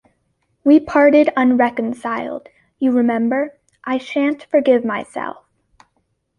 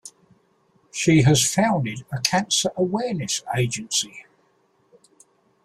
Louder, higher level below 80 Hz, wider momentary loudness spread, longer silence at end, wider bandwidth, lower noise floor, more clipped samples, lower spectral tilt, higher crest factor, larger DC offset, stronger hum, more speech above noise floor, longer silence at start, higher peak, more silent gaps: first, -17 LUFS vs -21 LUFS; second, -60 dBFS vs -54 dBFS; first, 15 LU vs 9 LU; second, 1.1 s vs 1.4 s; second, 10 kHz vs 15.5 kHz; first, -68 dBFS vs -64 dBFS; neither; first, -6.5 dB/octave vs -4 dB/octave; about the same, 16 dB vs 20 dB; neither; neither; first, 52 dB vs 42 dB; first, 0.65 s vs 0.05 s; about the same, -2 dBFS vs -2 dBFS; neither